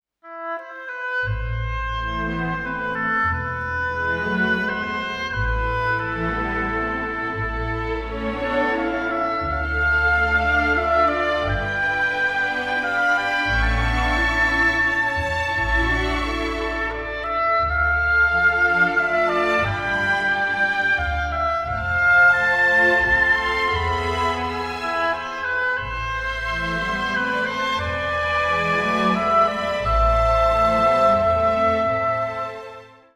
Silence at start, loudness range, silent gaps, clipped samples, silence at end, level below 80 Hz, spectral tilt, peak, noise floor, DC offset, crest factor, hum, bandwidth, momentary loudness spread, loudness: 0.25 s; 6 LU; none; under 0.1%; 0.3 s; -32 dBFS; -5.5 dB/octave; -6 dBFS; -41 dBFS; under 0.1%; 14 dB; none; 12.5 kHz; 9 LU; -20 LUFS